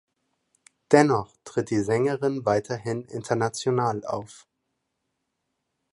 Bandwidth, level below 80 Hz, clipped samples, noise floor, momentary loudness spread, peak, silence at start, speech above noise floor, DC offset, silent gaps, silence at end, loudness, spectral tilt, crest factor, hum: 11.5 kHz; -62 dBFS; under 0.1%; -79 dBFS; 12 LU; -2 dBFS; 0.9 s; 55 dB; under 0.1%; none; 1.6 s; -25 LUFS; -6 dB/octave; 24 dB; none